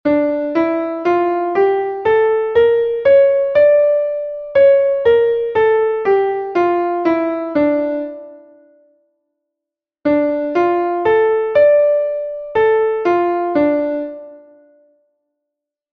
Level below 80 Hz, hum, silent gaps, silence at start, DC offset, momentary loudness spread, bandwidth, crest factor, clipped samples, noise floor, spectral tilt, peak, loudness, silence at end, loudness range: -54 dBFS; none; none; 0.05 s; under 0.1%; 9 LU; 5.6 kHz; 12 dB; under 0.1%; -84 dBFS; -7.5 dB/octave; -2 dBFS; -15 LUFS; 1.55 s; 7 LU